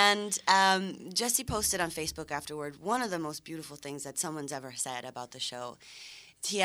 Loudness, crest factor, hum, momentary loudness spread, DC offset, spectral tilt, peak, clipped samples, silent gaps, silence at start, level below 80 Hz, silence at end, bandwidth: -31 LUFS; 26 dB; none; 17 LU; under 0.1%; -2 dB/octave; -6 dBFS; under 0.1%; none; 0 s; -58 dBFS; 0 s; over 20 kHz